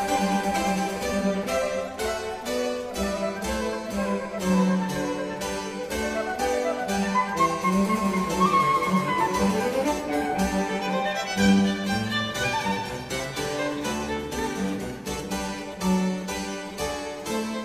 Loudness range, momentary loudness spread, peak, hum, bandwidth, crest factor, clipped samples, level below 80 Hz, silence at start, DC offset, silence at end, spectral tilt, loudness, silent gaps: 5 LU; 8 LU; -8 dBFS; none; 15.5 kHz; 16 dB; under 0.1%; -46 dBFS; 0 s; under 0.1%; 0 s; -5 dB/octave; -26 LUFS; none